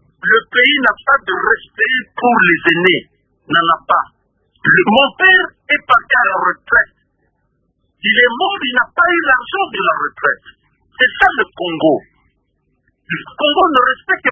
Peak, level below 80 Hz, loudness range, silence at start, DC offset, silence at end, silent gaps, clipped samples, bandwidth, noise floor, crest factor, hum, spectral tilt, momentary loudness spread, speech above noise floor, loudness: 0 dBFS; -50 dBFS; 4 LU; 0.25 s; under 0.1%; 0 s; none; under 0.1%; 8 kHz; -64 dBFS; 14 dB; none; -6 dB/octave; 8 LU; 50 dB; -13 LUFS